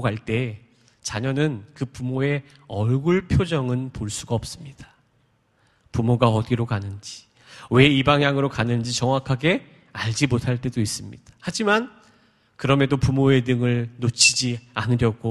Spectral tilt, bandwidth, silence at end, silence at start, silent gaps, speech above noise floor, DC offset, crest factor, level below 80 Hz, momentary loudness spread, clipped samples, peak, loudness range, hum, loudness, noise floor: -5 dB/octave; 12.5 kHz; 0 s; 0 s; none; 42 dB; under 0.1%; 22 dB; -46 dBFS; 16 LU; under 0.1%; 0 dBFS; 5 LU; none; -22 LUFS; -64 dBFS